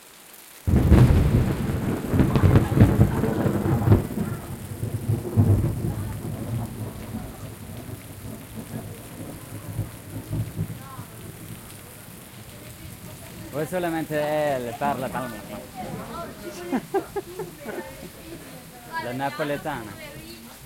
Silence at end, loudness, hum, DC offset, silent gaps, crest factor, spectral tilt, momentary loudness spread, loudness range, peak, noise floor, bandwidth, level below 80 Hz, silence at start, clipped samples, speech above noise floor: 0 s; -25 LUFS; none; under 0.1%; none; 22 dB; -7 dB/octave; 21 LU; 15 LU; -2 dBFS; -47 dBFS; 17 kHz; -36 dBFS; 0 s; under 0.1%; 19 dB